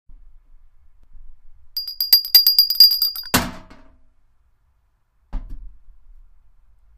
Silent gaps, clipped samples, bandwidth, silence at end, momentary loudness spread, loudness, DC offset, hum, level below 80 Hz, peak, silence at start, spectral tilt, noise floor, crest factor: none; under 0.1%; 16 kHz; 1.35 s; 26 LU; -13 LUFS; under 0.1%; none; -40 dBFS; 0 dBFS; 1.15 s; -1 dB/octave; -62 dBFS; 22 dB